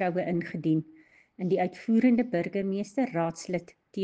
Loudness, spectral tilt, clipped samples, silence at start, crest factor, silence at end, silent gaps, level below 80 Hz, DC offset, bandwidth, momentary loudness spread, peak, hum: -29 LUFS; -7.5 dB/octave; under 0.1%; 0 s; 16 dB; 0 s; none; -70 dBFS; under 0.1%; 9.2 kHz; 11 LU; -12 dBFS; none